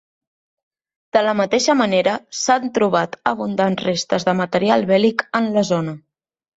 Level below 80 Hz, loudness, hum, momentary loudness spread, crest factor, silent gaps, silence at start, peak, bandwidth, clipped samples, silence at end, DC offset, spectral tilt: -62 dBFS; -18 LUFS; none; 6 LU; 16 dB; none; 1.15 s; -2 dBFS; 8 kHz; under 0.1%; 0.6 s; under 0.1%; -4.5 dB/octave